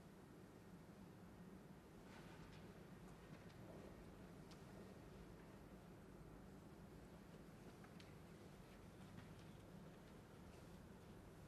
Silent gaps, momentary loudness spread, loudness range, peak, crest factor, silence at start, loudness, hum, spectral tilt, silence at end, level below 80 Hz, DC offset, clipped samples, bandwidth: none; 2 LU; 1 LU; -44 dBFS; 18 dB; 0 s; -62 LUFS; none; -6 dB/octave; 0 s; -72 dBFS; under 0.1%; under 0.1%; 13 kHz